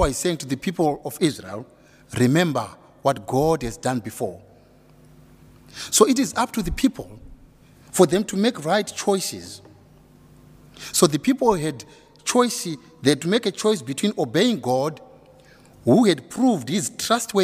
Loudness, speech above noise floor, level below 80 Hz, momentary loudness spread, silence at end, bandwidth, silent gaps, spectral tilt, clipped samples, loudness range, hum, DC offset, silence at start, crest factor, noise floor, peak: -22 LUFS; 30 dB; -44 dBFS; 16 LU; 0 s; 16 kHz; none; -4.5 dB/octave; under 0.1%; 2 LU; none; under 0.1%; 0 s; 22 dB; -52 dBFS; 0 dBFS